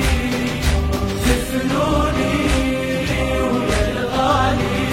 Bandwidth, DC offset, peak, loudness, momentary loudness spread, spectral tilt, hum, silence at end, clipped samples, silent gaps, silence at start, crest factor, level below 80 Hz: 16.5 kHz; under 0.1%; -2 dBFS; -19 LUFS; 3 LU; -5.5 dB/octave; none; 0 s; under 0.1%; none; 0 s; 16 dB; -24 dBFS